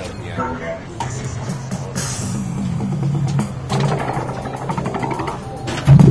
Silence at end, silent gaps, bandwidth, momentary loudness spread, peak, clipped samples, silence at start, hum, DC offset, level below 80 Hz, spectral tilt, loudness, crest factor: 0 s; none; 11 kHz; 7 LU; 0 dBFS; under 0.1%; 0 s; none; under 0.1%; -38 dBFS; -6.5 dB/octave; -21 LUFS; 18 dB